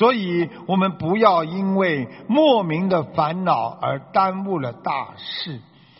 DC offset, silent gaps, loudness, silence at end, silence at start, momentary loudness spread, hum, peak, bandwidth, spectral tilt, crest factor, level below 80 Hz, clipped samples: under 0.1%; none; -21 LUFS; 0.35 s; 0 s; 11 LU; none; -2 dBFS; 5.8 kHz; -4.5 dB/octave; 18 dB; -60 dBFS; under 0.1%